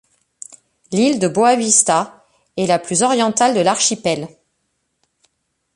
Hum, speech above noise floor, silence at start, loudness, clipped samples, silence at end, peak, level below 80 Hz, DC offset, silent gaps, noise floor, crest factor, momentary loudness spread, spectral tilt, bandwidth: none; 54 dB; 0.9 s; -15 LUFS; under 0.1%; 1.5 s; 0 dBFS; -62 dBFS; under 0.1%; none; -70 dBFS; 18 dB; 22 LU; -3 dB/octave; 11.5 kHz